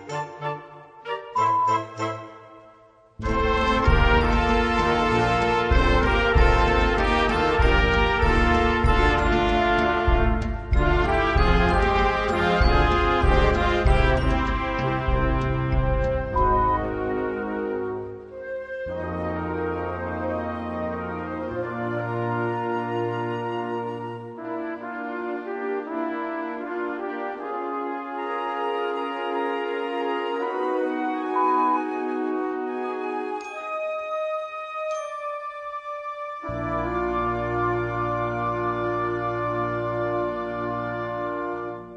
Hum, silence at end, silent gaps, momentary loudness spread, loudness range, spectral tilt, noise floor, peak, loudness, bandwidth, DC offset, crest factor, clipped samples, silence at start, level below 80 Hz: none; 0 s; none; 11 LU; 9 LU; -6.5 dB/octave; -53 dBFS; -4 dBFS; -24 LUFS; 9.6 kHz; under 0.1%; 18 dB; under 0.1%; 0 s; -30 dBFS